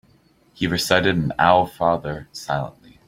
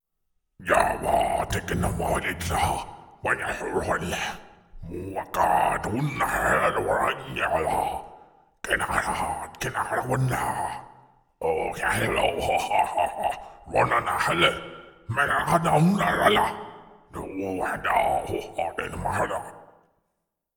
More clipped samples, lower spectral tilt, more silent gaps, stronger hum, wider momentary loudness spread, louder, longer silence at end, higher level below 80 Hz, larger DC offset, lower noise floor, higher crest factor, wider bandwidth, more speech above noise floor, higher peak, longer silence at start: neither; about the same, -5 dB/octave vs -4.5 dB/octave; neither; neither; about the same, 13 LU vs 14 LU; first, -20 LUFS vs -25 LUFS; second, 0.4 s vs 0.9 s; second, -50 dBFS vs -44 dBFS; neither; second, -57 dBFS vs -79 dBFS; about the same, 20 dB vs 20 dB; second, 16.5 kHz vs over 20 kHz; second, 37 dB vs 54 dB; first, -2 dBFS vs -6 dBFS; about the same, 0.6 s vs 0.6 s